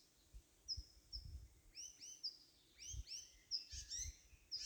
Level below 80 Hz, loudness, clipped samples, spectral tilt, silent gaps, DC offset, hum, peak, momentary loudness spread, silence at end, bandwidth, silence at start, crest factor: -62 dBFS; -50 LUFS; under 0.1%; -0.5 dB/octave; none; under 0.1%; none; -30 dBFS; 18 LU; 0 s; over 20 kHz; 0 s; 22 dB